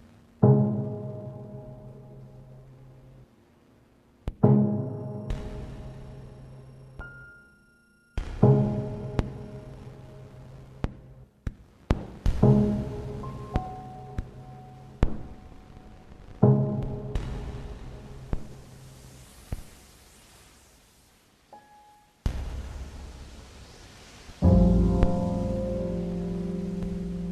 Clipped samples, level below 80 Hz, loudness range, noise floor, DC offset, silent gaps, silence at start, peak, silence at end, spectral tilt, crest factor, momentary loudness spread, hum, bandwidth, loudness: under 0.1%; -38 dBFS; 16 LU; -61 dBFS; under 0.1%; none; 0.4 s; -6 dBFS; 0 s; -9 dB/octave; 24 dB; 26 LU; none; 11.5 kHz; -27 LUFS